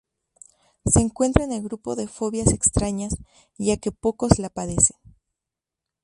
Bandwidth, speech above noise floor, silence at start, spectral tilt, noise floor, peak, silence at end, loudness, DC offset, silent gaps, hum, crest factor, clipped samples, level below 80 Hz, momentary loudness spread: 11.5 kHz; 64 dB; 0.85 s; -5 dB/octave; -87 dBFS; 0 dBFS; 1.15 s; -22 LUFS; under 0.1%; none; none; 24 dB; under 0.1%; -36 dBFS; 11 LU